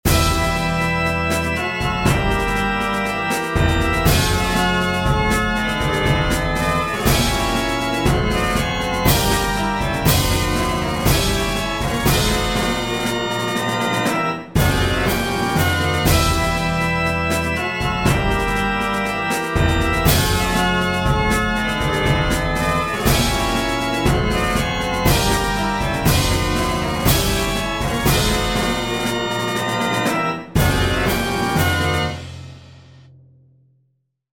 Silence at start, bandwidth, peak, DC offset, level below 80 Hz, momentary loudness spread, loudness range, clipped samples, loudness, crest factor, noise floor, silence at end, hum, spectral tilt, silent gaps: 0.05 s; 17 kHz; -2 dBFS; under 0.1%; -28 dBFS; 4 LU; 1 LU; under 0.1%; -18 LUFS; 16 dB; -67 dBFS; 1.5 s; none; -4.5 dB/octave; none